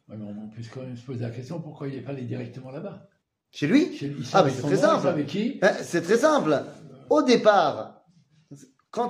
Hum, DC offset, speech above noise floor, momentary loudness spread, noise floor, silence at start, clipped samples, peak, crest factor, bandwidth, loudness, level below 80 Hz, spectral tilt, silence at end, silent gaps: none; under 0.1%; 37 dB; 18 LU; -61 dBFS; 0.1 s; under 0.1%; -4 dBFS; 20 dB; 15 kHz; -23 LUFS; -70 dBFS; -5.5 dB/octave; 0 s; none